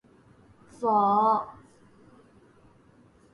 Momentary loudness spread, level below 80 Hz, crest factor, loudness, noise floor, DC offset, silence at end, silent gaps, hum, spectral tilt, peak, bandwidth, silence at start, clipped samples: 11 LU; -70 dBFS; 18 dB; -24 LUFS; -58 dBFS; under 0.1%; 1.85 s; none; none; -7.5 dB/octave; -12 dBFS; 11 kHz; 0.8 s; under 0.1%